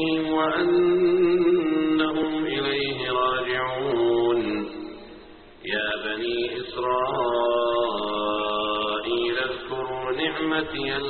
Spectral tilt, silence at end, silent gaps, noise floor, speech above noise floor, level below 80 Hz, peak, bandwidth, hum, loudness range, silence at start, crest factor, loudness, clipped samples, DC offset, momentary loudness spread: -2.5 dB/octave; 0 s; none; -46 dBFS; 24 dB; -54 dBFS; -10 dBFS; 4.5 kHz; none; 4 LU; 0 s; 14 dB; -24 LUFS; under 0.1%; under 0.1%; 9 LU